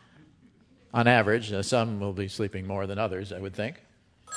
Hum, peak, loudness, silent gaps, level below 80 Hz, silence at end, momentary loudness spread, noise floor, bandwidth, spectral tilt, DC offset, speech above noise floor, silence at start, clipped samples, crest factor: none; -4 dBFS; -28 LUFS; none; -64 dBFS; 0 s; 13 LU; -59 dBFS; 11 kHz; -5.5 dB/octave; under 0.1%; 32 dB; 0.95 s; under 0.1%; 26 dB